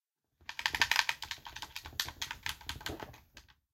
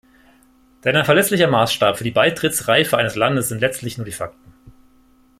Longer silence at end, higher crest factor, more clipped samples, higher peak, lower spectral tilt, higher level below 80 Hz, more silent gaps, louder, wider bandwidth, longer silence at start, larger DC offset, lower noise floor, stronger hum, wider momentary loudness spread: second, 0.3 s vs 0.7 s; first, 34 dB vs 18 dB; neither; second, -6 dBFS vs -2 dBFS; second, -0.5 dB/octave vs -4 dB/octave; about the same, -58 dBFS vs -54 dBFS; neither; second, -35 LUFS vs -17 LUFS; about the same, 17 kHz vs 16.5 kHz; second, 0.4 s vs 0.85 s; neither; first, -61 dBFS vs -54 dBFS; neither; first, 17 LU vs 13 LU